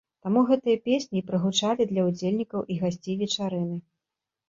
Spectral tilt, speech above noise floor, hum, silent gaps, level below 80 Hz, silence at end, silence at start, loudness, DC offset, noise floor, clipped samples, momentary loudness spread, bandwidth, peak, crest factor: -5.5 dB/octave; 62 dB; none; none; -66 dBFS; 0.7 s; 0.25 s; -26 LUFS; under 0.1%; -87 dBFS; under 0.1%; 8 LU; 7.6 kHz; -10 dBFS; 16 dB